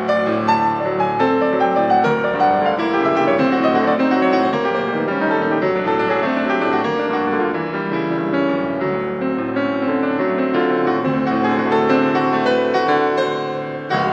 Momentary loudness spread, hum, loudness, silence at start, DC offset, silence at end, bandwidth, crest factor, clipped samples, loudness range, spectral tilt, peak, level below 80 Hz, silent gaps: 5 LU; none; -18 LUFS; 0 s; under 0.1%; 0 s; 7.8 kHz; 14 dB; under 0.1%; 3 LU; -7 dB/octave; -4 dBFS; -56 dBFS; none